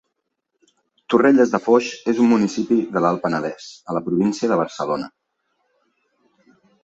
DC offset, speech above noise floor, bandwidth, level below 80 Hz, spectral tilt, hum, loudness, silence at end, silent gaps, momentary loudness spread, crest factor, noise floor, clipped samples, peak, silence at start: under 0.1%; 58 dB; 8 kHz; -64 dBFS; -6 dB/octave; none; -19 LUFS; 1.75 s; none; 12 LU; 18 dB; -76 dBFS; under 0.1%; -2 dBFS; 1.1 s